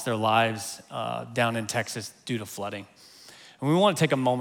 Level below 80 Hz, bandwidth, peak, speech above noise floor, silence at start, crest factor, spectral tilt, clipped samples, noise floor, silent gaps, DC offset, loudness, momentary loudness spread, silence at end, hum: -74 dBFS; 19.5 kHz; -8 dBFS; 24 dB; 0 s; 20 dB; -4.5 dB/octave; under 0.1%; -50 dBFS; none; under 0.1%; -27 LUFS; 14 LU; 0 s; none